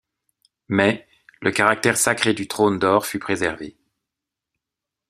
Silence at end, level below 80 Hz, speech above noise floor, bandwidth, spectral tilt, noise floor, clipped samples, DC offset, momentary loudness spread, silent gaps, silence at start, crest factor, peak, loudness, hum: 1.4 s; -60 dBFS; 66 dB; 15 kHz; -3.5 dB/octave; -86 dBFS; under 0.1%; under 0.1%; 8 LU; none; 0.7 s; 22 dB; 0 dBFS; -20 LUFS; none